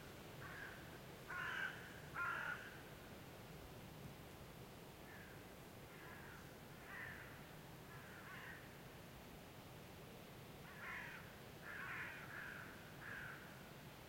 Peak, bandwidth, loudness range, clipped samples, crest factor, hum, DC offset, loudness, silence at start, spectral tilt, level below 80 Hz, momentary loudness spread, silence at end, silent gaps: -34 dBFS; 16.5 kHz; 8 LU; under 0.1%; 20 dB; none; under 0.1%; -53 LUFS; 0 s; -4 dB/octave; -70 dBFS; 11 LU; 0 s; none